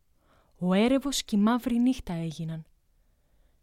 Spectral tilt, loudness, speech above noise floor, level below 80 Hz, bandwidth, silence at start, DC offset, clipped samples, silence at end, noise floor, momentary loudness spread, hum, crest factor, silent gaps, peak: -5.5 dB/octave; -27 LUFS; 40 dB; -52 dBFS; 15.5 kHz; 0.6 s; under 0.1%; under 0.1%; 1 s; -66 dBFS; 12 LU; none; 16 dB; none; -12 dBFS